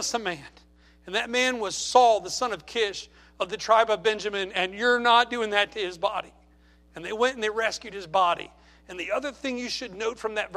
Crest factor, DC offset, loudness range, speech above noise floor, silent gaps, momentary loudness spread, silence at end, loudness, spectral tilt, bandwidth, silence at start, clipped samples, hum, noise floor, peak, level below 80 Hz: 22 dB; under 0.1%; 5 LU; 31 dB; none; 15 LU; 0 s; -25 LUFS; -2 dB/octave; 14.5 kHz; 0 s; under 0.1%; none; -57 dBFS; -4 dBFS; -58 dBFS